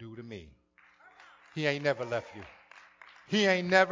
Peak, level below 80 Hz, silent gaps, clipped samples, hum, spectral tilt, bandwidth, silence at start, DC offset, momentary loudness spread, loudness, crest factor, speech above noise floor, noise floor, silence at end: -10 dBFS; -68 dBFS; none; under 0.1%; none; -4.5 dB/octave; 7.6 kHz; 0 s; under 0.1%; 24 LU; -29 LUFS; 24 dB; 35 dB; -63 dBFS; 0 s